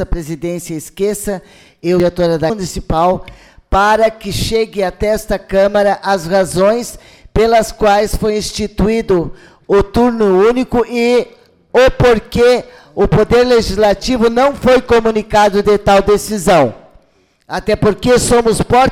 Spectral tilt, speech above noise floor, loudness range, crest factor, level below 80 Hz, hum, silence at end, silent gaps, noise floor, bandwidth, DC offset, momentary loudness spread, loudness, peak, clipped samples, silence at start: -5 dB/octave; 42 dB; 4 LU; 10 dB; -28 dBFS; none; 0 s; none; -54 dBFS; 16 kHz; under 0.1%; 11 LU; -13 LUFS; -2 dBFS; under 0.1%; 0 s